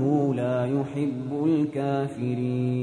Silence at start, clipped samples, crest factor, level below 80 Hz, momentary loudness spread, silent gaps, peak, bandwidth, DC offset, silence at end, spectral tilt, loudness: 0 s; under 0.1%; 14 dB; -64 dBFS; 4 LU; none; -12 dBFS; 10 kHz; under 0.1%; 0 s; -9 dB/octave; -26 LUFS